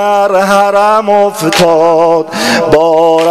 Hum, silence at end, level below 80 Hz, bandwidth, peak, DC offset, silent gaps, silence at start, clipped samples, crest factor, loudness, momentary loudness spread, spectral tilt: none; 0 s; -42 dBFS; 16 kHz; 0 dBFS; 0.7%; none; 0 s; 0.4%; 8 dB; -8 LUFS; 3 LU; -4 dB/octave